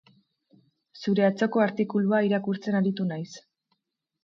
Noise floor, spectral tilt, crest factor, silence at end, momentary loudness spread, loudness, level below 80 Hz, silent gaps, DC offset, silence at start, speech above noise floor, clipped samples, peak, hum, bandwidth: -77 dBFS; -7.5 dB/octave; 16 dB; 0.85 s; 12 LU; -26 LUFS; -74 dBFS; none; under 0.1%; 0.95 s; 53 dB; under 0.1%; -10 dBFS; none; 7.4 kHz